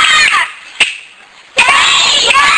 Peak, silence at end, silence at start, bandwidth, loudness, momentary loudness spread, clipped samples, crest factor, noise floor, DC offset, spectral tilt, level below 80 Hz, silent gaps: 0 dBFS; 0 s; 0 s; 10.5 kHz; -8 LUFS; 10 LU; under 0.1%; 10 dB; -38 dBFS; under 0.1%; 1.5 dB/octave; -44 dBFS; none